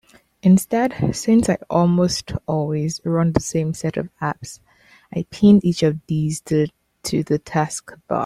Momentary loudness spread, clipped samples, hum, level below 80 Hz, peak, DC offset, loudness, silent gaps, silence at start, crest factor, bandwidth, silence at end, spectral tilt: 11 LU; under 0.1%; none; -46 dBFS; -2 dBFS; under 0.1%; -20 LUFS; none; 0.45 s; 18 dB; 14 kHz; 0 s; -6.5 dB/octave